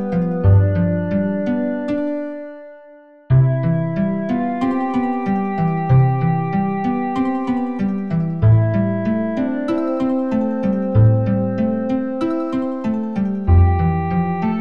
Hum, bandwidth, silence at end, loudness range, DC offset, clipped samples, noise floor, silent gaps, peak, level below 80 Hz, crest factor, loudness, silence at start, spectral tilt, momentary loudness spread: none; 5.4 kHz; 0 s; 2 LU; 1%; under 0.1%; -44 dBFS; none; -2 dBFS; -36 dBFS; 14 dB; -18 LUFS; 0 s; -10.5 dB/octave; 7 LU